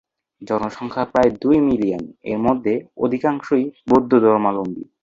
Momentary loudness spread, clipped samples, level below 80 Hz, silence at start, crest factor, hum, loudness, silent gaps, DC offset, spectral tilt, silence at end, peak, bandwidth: 10 LU; under 0.1%; -52 dBFS; 0.4 s; 16 dB; none; -19 LUFS; none; under 0.1%; -8 dB/octave; 0.2 s; -2 dBFS; 7.4 kHz